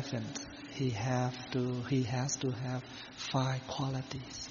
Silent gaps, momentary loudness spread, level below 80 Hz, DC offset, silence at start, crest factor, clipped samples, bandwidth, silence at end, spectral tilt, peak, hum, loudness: none; 8 LU; -62 dBFS; under 0.1%; 0 s; 18 dB; under 0.1%; 7.2 kHz; 0 s; -5.5 dB/octave; -18 dBFS; none; -36 LUFS